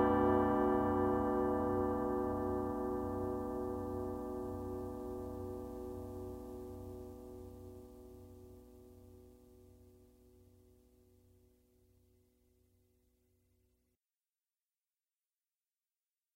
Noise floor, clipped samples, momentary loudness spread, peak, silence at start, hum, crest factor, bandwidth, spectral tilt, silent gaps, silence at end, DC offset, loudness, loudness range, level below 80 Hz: under -90 dBFS; under 0.1%; 24 LU; -20 dBFS; 0 s; none; 20 dB; 16 kHz; -8.5 dB/octave; none; 6.6 s; under 0.1%; -37 LUFS; 23 LU; -58 dBFS